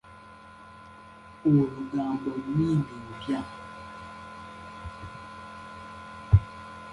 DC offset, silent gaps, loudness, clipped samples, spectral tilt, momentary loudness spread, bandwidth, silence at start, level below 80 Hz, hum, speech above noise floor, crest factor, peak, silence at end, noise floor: under 0.1%; none; -27 LUFS; under 0.1%; -8.5 dB/octave; 24 LU; 11 kHz; 0.05 s; -42 dBFS; none; 23 dB; 24 dB; -6 dBFS; 0 s; -49 dBFS